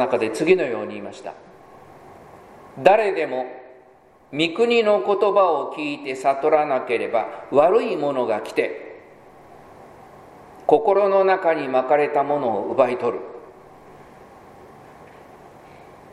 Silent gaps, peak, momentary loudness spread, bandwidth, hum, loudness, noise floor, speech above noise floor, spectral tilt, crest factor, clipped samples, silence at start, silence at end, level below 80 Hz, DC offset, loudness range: none; 0 dBFS; 16 LU; 12 kHz; none; -20 LUFS; -52 dBFS; 32 dB; -5.5 dB/octave; 22 dB; under 0.1%; 0 s; 0.65 s; -64 dBFS; under 0.1%; 5 LU